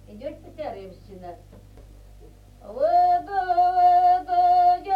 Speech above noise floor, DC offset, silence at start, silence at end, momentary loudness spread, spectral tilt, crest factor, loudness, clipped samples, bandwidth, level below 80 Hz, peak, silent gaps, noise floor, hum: 10 dB; under 0.1%; 0.1 s; 0 s; 24 LU; -6 dB/octave; 12 dB; -20 LUFS; under 0.1%; 5.2 kHz; -50 dBFS; -10 dBFS; none; -48 dBFS; none